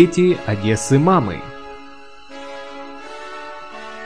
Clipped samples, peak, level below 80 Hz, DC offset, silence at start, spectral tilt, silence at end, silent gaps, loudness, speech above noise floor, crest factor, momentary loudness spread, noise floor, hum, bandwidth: under 0.1%; 0 dBFS; -48 dBFS; 1%; 0 s; -6 dB/octave; 0 s; none; -17 LUFS; 26 dB; 20 dB; 22 LU; -42 dBFS; none; 10.5 kHz